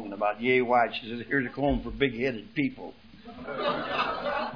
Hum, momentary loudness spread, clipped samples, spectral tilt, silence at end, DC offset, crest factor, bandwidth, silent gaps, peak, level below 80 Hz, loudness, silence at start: none; 14 LU; under 0.1%; -7.5 dB/octave; 0 s; 0.1%; 20 dB; 5.4 kHz; none; -10 dBFS; -48 dBFS; -28 LUFS; 0 s